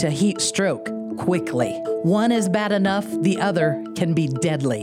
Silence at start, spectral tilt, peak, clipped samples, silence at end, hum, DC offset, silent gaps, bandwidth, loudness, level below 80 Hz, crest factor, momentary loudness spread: 0 s; -5.5 dB/octave; -6 dBFS; under 0.1%; 0 s; none; under 0.1%; none; 15.5 kHz; -21 LUFS; -62 dBFS; 16 dB; 5 LU